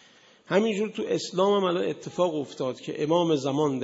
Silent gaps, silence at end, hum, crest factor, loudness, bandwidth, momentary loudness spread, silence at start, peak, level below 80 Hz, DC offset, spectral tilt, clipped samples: none; 0 s; none; 18 dB; -26 LUFS; 8 kHz; 8 LU; 0.5 s; -8 dBFS; -72 dBFS; under 0.1%; -5.5 dB/octave; under 0.1%